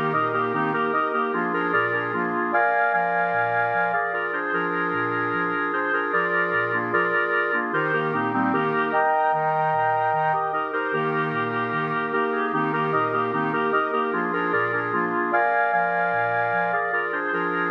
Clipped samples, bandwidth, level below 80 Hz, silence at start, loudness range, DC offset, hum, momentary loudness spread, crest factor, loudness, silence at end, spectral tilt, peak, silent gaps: under 0.1%; 6.2 kHz; -78 dBFS; 0 s; 1 LU; under 0.1%; none; 3 LU; 14 dB; -23 LUFS; 0 s; -8 dB/octave; -8 dBFS; none